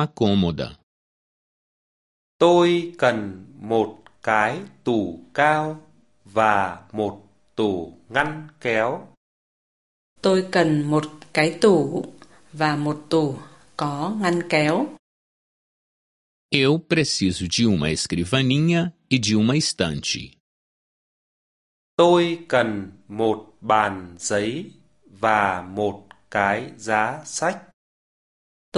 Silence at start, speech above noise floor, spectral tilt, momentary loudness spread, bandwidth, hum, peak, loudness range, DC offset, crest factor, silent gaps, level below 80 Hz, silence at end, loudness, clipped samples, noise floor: 0 s; over 69 dB; -5 dB/octave; 11 LU; 11.5 kHz; none; -2 dBFS; 4 LU; 0.1%; 22 dB; 0.83-2.39 s, 9.17-10.16 s, 14.99-16.49 s, 20.40-21.97 s, 27.73-28.72 s; -50 dBFS; 0 s; -22 LUFS; under 0.1%; under -90 dBFS